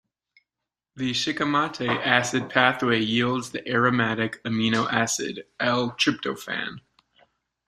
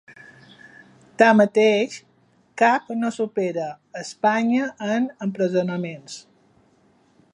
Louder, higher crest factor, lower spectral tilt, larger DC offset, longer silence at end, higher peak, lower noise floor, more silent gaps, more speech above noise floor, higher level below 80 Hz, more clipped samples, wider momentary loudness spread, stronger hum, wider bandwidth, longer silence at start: second, -24 LUFS vs -21 LUFS; about the same, 24 dB vs 22 dB; second, -4 dB/octave vs -5.5 dB/octave; neither; second, 0.9 s vs 1.15 s; about the same, -2 dBFS vs -2 dBFS; first, -87 dBFS vs -59 dBFS; neither; first, 63 dB vs 39 dB; first, -64 dBFS vs -74 dBFS; neither; second, 9 LU vs 19 LU; neither; first, 14 kHz vs 10.5 kHz; first, 0.95 s vs 0.1 s